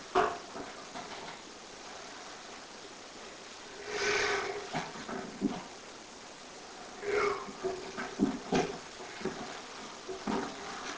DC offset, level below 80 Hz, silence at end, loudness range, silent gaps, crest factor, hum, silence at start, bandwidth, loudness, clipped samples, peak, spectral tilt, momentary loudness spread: under 0.1%; -64 dBFS; 0 s; 6 LU; none; 24 dB; none; 0 s; 8 kHz; -37 LUFS; under 0.1%; -14 dBFS; -3.5 dB/octave; 15 LU